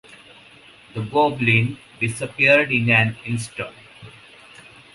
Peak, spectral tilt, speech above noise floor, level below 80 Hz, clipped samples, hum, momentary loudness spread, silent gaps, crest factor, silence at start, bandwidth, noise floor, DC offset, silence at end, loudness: -2 dBFS; -5.5 dB/octave; 28 dB; -56 dBFS; under 0.1%; none; 17 LU; none; 20 dB; 0.1 s; 11.5 kHz; -48 dBFS; under 0.1%; 0.85 s; -19 LUFS